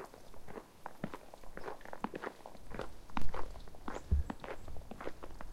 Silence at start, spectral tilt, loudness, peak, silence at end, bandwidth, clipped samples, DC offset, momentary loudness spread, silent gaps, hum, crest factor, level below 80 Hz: 0 s; -6.5 dB/octave; -45 LUFS; -18 dBFS; 0 s; 14 kHz; under 0.1%; under 0.1%; 14 LU; none; none; 18 dB; -46 dBFS